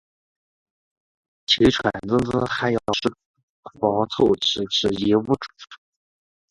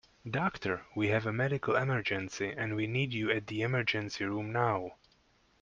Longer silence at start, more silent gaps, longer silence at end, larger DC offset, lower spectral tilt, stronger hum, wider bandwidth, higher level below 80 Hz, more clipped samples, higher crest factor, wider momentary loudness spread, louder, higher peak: first, 1.5 s vs 0.25 s; first, 3.26-3.34 s, 3.43-3.63 s vs none; about the same, 0.75 s vs 0.65 s; neither; about the same, -5 dB/octave vs -6 dB/octave; neither; first, 11.5 kHz vs 7.4 kHz; first, -48 dBFS vs -66 dBFS; neither; about the same, 20 dB vs 20 dB; about the same, 8 LU vs 6 LU; first, -21 LUFS vs -33 LUFS; first, -2 dBFS vs -14 dBFS